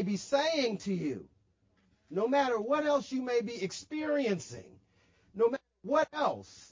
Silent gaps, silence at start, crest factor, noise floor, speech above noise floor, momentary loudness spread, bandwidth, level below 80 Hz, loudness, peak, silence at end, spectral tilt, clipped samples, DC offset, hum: none; 0 s; 18 dB; -71 dBFS; 39 dB; 11 LU; 7.6 kHz; -70 dBFS; -32 LUFS; -16 dBFS; 0.05 s; -5 dB/octave; under 0.1%; under 0.1%; none